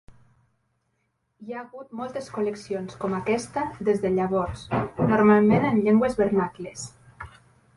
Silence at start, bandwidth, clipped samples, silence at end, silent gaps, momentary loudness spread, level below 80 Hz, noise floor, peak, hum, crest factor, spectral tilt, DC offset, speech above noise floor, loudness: 1.4 s; 11.5 kHz; under 0.1%; 0.5 s; none; 20 LU; -52 dBFS; -74 dBFS; -6 dBFS; none; 20 dB; -7 dB/octave; under 0.1%; 50 dB; -24 LUFS